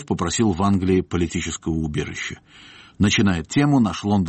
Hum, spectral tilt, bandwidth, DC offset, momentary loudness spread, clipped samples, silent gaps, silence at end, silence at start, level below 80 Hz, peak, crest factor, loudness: none; -5.5 dB/octave; 8.8 kHz; under 0.1%; 9 LU; under 0.1%; none; 0 s; 0 s; -42 dBFS; -8 dBFS; 14 dB; -21 LUFS